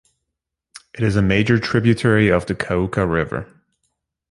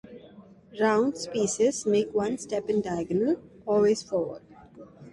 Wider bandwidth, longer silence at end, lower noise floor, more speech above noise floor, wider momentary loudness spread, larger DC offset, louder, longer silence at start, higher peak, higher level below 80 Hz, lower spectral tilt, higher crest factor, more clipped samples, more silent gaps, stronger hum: about the same, 11.5 kHz vs 11.5 kHz; first, 0.85 s vs 0.05 s; first, -81 dBFS vs -51 dBFS; first, 63 dB vs 25 dB; about the same, 8 LU vs 8 LU; neither; first, -18 LUFS vs -27 LUFS; first, 0.75 s vs 0.05 s; first, -2 dBFS vs -12 dBFS; first, -40 dBFS vs -62 dBFS; first, -7 dB/octave vs -5 dB/octave; about the same, 18 dB vs 16 dB; neither; neither; neither